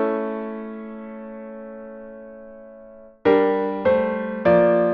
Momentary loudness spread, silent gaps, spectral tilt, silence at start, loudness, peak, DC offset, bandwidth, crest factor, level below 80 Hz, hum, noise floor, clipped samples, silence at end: 23 LU; none; -9.5 dB/octave; 0 s; -20 LUFS; -6 dBFS; under 0.1%; 5.2 kHz; 16 dB; -56 dBFS; none; -44 dBFS; under 0.1%; 0 s